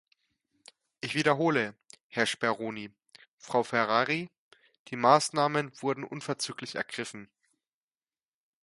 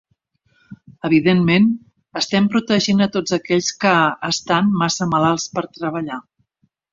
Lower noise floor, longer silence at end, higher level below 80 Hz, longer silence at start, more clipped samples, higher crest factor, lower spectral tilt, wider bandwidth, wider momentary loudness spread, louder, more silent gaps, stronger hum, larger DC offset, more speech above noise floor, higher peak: first, under -90 dBFS vs -66 dBFS; first, 1.4 s vs 0.7 s; second, -76 dBFS vs -56 dBFS; first, 1.05 s vs 0.7 s; neither; first, 26 dB vs 16 dB; about the same, -4 dB/octave vs -5 dB/octave; first, 11.5 kHz vs 7.6 kHz; first, 16 LU vs 11 LU; second, -29 LUFS vs -18 LUFS; first, 2.03-2.10 s, 3.28-3.38 s, 4.38-4.51 s, 4.79-4.85 s vs none; neither; neither; first, over 61 dB vs 49 dB; second, -6 dBFS vs -2 dBFS